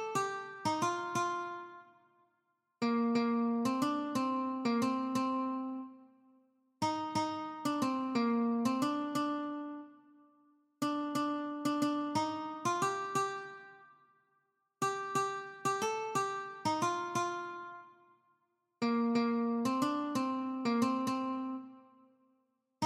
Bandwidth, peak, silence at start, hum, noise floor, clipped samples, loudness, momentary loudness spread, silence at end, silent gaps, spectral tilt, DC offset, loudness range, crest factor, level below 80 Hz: 15.5 kHz; -18 dBFS; 0 s; none; -80 dBFS; under 0.1%; -35 LUFS; 11 LU; 0 s; none; -4.5 dB/octave; under 0.1%; 4 LU; 18 dB; -82 dBFS